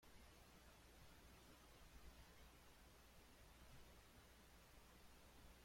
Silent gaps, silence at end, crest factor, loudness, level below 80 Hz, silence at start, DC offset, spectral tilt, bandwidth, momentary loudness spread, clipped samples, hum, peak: none; 0 s; 16 dB; -67 LUFS; -70 dBFS; 0 s; under 0.1%; -3.5 dB/octave; 16.5 kHz; 2 LU; under 0.1%; none; -50 dBFS